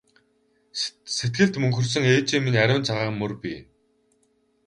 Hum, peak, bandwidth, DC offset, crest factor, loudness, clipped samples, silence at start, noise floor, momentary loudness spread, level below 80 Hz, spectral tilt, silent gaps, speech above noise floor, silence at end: none; -4 dBFS; 11 kHz; under 0.1%; 20 dB; -23 LUFS; under 0.1%; 0.75 s; -67 dBFS; 13 LU; -58 dBFS; -5 dB/octave; none; 44 dB; 1.05 s